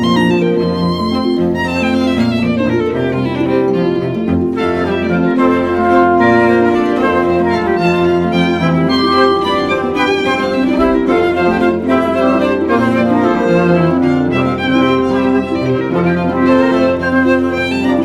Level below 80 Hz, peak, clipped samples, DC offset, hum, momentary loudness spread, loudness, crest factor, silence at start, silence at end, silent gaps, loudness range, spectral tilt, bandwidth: -40 dBFS; 0 dBFS; under 0.1%; under 0.1%; none; 4 LU; -13 LUFS; 12 dB; 0 s; 0 s; none; 3 LU; -7 dB/octave; 11.5 kHz